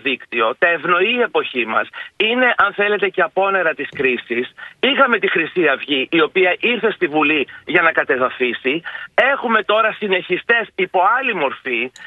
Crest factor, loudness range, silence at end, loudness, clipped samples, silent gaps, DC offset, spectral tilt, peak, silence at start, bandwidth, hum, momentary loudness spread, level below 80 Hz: 18 dB; 1 LU; 0 s; -17 LUFS; under 0.1%; none; under 0.1%; -5.5 dB/octave; 0 dBFS; 0.05 s; 7.2 kHz; none; 6 LU; -64 dBFS